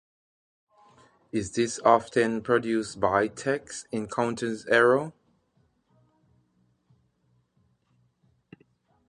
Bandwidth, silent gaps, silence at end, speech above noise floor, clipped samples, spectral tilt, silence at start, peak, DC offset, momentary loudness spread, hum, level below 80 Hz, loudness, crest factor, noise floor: 11 kHz; none; 4 s; 44 dB; under 0.1%; -4.5 dB/octave; 1.35 s; -4 dBFS; under 0.1%; 11 LU; none; -62 dBFS; -26 LUFS; 24 dB; -69 dBFS